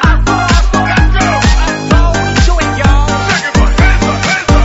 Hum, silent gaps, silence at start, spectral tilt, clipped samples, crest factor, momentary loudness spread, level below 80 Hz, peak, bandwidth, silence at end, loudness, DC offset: none; none; 0 s; -5 dB/octave; 0.2%; 8 dB; 2 LU; -12 dBFS; 0 dBFS; 8 kHz; 0 s; -10 LUFS; under 0.1%